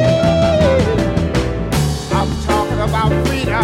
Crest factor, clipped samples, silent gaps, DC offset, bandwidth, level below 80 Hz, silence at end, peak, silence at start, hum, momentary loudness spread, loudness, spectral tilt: 14 dB; under 0.1%; none; under 0.1%; 16 kHz; -24 dBFS; 0 s; -2 dBFS; 0 s; none; 5 LU; -16 LUFS; -6 dB/octave